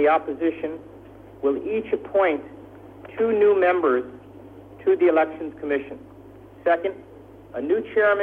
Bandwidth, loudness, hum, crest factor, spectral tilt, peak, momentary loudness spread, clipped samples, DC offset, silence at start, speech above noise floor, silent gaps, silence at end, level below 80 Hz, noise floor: 4 kHz; -23 LUFS; none; 14 dB; -8 dB/octave; -8 dBFS; 23 LU; under 0.1%; under 0.1%; 0 s; 23 dB; none; 0 s; -58 dBFS; -45 dBFS